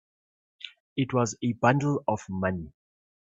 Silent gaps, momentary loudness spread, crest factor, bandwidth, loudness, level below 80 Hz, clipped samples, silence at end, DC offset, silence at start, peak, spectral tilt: 0.80-0.96 s; 20 LU; 22 dB; 8 kHz; -28 LUFS; -62 dBFS; under 0.1%; 0.55 s; under 0.1%; 0.65 s; -8 dBFS; -6 dB/octave